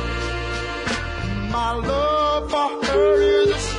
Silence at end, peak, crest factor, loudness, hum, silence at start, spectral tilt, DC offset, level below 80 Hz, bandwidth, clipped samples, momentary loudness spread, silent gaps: 0 s; -8 dBFS; 14 dB; -21 LUFS; none; 0 s; -4.5 dB/octave; under 0.1%; -32 dBFS; 10.5 kHz; under 0.1%; 9 LU; none